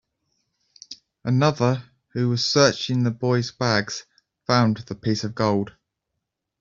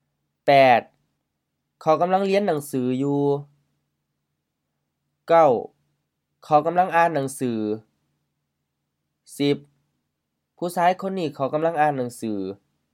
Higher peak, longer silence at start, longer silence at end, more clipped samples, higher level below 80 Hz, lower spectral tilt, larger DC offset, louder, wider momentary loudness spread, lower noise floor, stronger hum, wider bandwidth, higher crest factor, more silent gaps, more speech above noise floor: about the same, -4 dBFS vs -4 dBFS; first, 0.9 s vs 0.45 s; first, 0.9 s vs 0.4 s; neither; first, -60 dBFS vs -76 dBFS; about the same, -5.5 dB/octave vs -6 dB/octave; neither; about the same, -22 LUFS vs -22 LUFS; first, 16 LU vs 12 LU; about the same, -81 dBFS vs -79 dBFS; neither; second, 7.6 kHz vs 16 kHz; about the same, 20 dB vs 20 dB; neither; about the same, 60 dB vs 58 dB